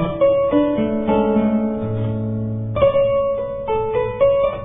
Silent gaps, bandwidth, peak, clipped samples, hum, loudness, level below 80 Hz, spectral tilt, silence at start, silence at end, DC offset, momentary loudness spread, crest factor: none; 3.8 kHz; -4 dBFS; under 0.1%; none; -19 LUFS; -40 dBFS; -12 dB/octave; 0 s; 0 s; under 0.1%; 7 LU; 14 dB